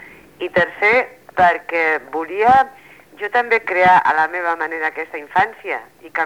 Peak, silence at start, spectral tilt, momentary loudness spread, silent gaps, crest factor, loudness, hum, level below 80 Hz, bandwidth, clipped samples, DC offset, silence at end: -2 dBFS; 0 s; -5 dB/octave; 13 LU; none; 14 dB; -17 LUFS; none; -54 dBFS; 15.5 kHz; under 0.1%; 0.1%; 0 s